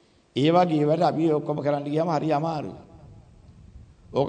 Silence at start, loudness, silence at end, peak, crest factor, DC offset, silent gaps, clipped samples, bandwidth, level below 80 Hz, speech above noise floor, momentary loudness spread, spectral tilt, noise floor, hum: 0.35 s; -24 LUFS; 0 s; -8 dBFS; 16 dB; under 0.1%; none; under 0.1%; 9.2 kHz; -58 dBFS; 27 dB; 11 LU; -8 dB/octave; -50 dBFS; none